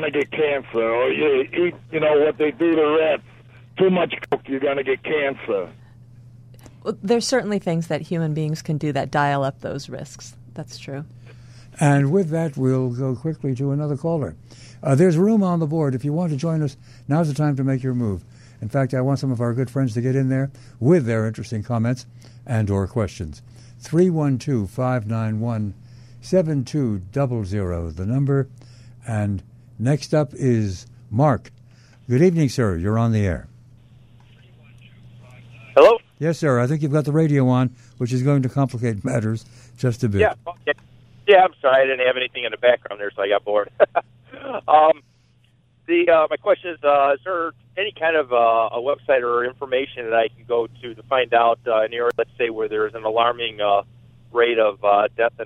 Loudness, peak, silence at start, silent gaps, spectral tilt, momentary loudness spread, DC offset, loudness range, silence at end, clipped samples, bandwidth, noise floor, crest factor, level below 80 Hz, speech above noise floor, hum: -21 LUFS; -2 dBFS; 0 s; none; -7 dB/octave; 11 LU; under 0.1%; 5 LU; 0 s; under 0.1%; 12 kHz; -58 dBFS; 20 dB; -50 dBFS; 37 dB; none